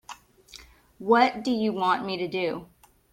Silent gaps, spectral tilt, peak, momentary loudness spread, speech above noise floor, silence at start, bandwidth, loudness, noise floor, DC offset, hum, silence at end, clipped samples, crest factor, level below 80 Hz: none; -5.5 dB/octave; -8 dBFS; 17 LU; 26 dB; 0.1 s; 16 kHz; -25 LUFS; -51 dBFS; under 0.1%; none; 0.5 s; under 0.1%; 20 dB; -62 dBFS